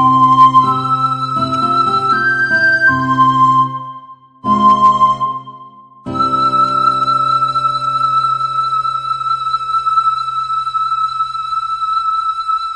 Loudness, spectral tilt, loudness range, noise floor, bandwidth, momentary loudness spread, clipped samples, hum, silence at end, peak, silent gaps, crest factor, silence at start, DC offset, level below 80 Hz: -13 LUFS; -5 dB/octave; 4 LU; -38 dBFS; 10 kHz; 9 LU; under 0.1%; none; 0 s; 0 dBFS; none; 14 dB; 0 s; under 0.1%; -50 dBFS